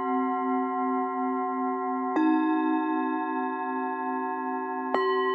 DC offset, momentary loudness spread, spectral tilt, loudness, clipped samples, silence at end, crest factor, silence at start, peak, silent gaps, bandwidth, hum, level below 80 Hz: under 0.1%; 6 LU; -6 dB/octave; -28 LUFS; under 0.1%; 0 s; 18 dB; 0 s; -10 dBFS; none; 5 kHz; none; -88 dBFS